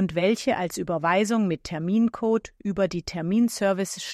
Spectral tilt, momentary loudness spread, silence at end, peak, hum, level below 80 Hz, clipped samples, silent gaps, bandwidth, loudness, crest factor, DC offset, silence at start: -5.5 dB/octave; 6 LU; 0 s; -10 dBFS; none; -54 dBFS; under 0.1%; none; 14 kHz; -25 LUFS; 14 dB; under 0.1%; 0 s